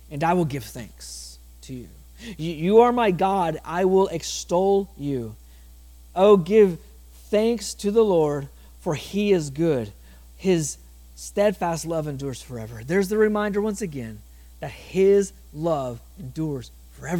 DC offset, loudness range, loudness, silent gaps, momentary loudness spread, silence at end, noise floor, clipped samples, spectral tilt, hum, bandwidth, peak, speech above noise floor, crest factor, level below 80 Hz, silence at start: under 0.1%; 5 LU; -23 LUFS; none; 19 LU; 0 s; -46 dBFS; under 0.1%; -6 dB/octave; none; 17.5 kHz; -4 dBFS; 24 dB; 20 dB; -46 dBFS; 0.1 s